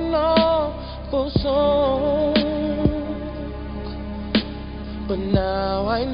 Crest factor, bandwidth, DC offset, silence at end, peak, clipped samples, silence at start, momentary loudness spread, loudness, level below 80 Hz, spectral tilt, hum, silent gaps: 18 dB; 5.4 kHz; under 0.1%; 0 s; -4 dBFS; under 0.1%; 0 s; 13 LU; -22 LUFS; -34 dBFS; -11.5 dB/octave; none; none